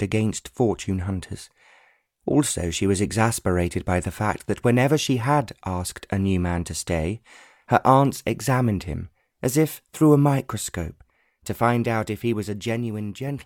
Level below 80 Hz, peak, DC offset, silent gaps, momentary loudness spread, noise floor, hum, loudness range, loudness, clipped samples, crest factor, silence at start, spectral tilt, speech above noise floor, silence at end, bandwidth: -44 dBFS; -2 dBFS; under 0.1%; none; 12 LU; -60 dBFS; none; 3 LU; -23 LUFS; under 0.1%; 22 dB; 0 s; -5.5 dB/octave; 38 dB; 0 s; 17.5 kHz